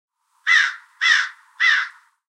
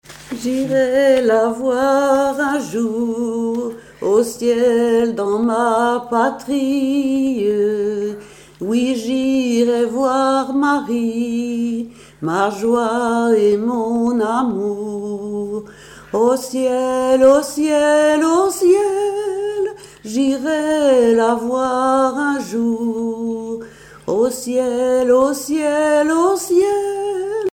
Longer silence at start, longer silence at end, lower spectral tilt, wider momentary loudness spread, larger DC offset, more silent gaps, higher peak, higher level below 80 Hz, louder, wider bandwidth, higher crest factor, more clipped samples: first, 0.45 s vs 0.1 s; first, 0.45 s vs 0.05 s; second, 10.5 dB/octave vs -4.5 dB/octave; about the same, 11 LU vs 10 LU; neither; neither; about the same, -2 dBFS vs -2 dBFS; second, under -90 dBFS vs -54 dBFS; about the same, -17 LUFS vs -17 LUFS; second, 10.5 kHz vs 17 kHz; about the same, 18 dB vs 14 dB; neither